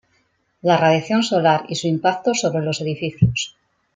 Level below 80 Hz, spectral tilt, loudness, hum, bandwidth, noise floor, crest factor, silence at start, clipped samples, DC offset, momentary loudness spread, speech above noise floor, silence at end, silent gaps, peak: -48 dBFS; -5 dB/octave; -19 LUFS; none; 9.6 kHz; -65 dBFS; 18 dB; 0.65 s; under 0.1%; under 0.1%; 8 LU; 46 dB; 0.45 s; none; -2 dBFS